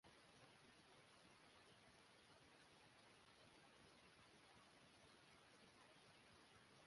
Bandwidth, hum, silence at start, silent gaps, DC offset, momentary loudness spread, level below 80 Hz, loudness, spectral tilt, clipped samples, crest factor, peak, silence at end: 11.5 kHz; none; 0.05 s; none; under 0.1%; 1 LU; -88 dBFS; -69 LUFS; -3 dB/octave; under 0.1%; 16 dB; -54 dBFS; 0 s